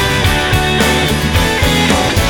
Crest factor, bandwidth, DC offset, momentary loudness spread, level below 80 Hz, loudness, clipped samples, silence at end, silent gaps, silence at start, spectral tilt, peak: 12 dB; 19 kHz; under 0.1%; 2 LU; -22 dBFS; -12 LUFS; under 0.1%; 0 s; none; 0 s; -4 dB/octave; 0 dBFS